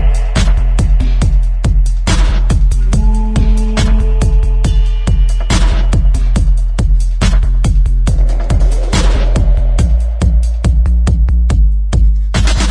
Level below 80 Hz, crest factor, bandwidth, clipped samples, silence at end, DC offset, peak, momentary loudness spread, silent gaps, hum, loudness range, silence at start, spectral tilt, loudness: -10 dBFS; 10 dB; 10.5 kHz; under 0.1%; 0 s; under 0.1%; 0 dBFS; 2 LU; none; none; 1 LU; 0 s; -5.5 dB/octave; -13 LUFS